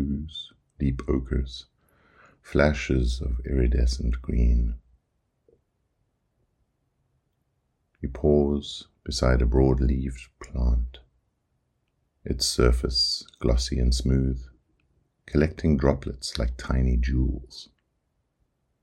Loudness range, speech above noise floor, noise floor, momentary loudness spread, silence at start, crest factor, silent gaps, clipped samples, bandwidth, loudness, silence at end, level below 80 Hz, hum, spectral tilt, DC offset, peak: 5 LU; 51 dB; -74 dBFS; 15 LU; 0 s; 22 dB; none; under 0.1%; 12 kHz; -25 LUFS; 1.2 s; -30 dBFS; none; -6 dB/octave; under 0.1%; -6 dBFS